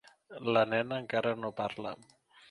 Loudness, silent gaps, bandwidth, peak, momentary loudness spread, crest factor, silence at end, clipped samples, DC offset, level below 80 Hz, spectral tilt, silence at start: -33 LUFS; none; 11 kHz; -12 dBFS; 15 LU; 20 dB; 0.55 s; under 0.1%; under 0.1%; -72 dBFS; -6.5 dB/octave; 0.3 s